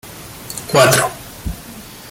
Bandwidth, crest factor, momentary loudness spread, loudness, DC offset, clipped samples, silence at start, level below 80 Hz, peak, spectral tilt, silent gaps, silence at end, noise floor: 17 kHz; 18 dB; 22 LU; -14 LUFS; under 0.1%; under 0.1%; 0.05 s; -38 dBFS; 0 dBFS; -3.5 dB/octave; none; 0 s; -35 dBFS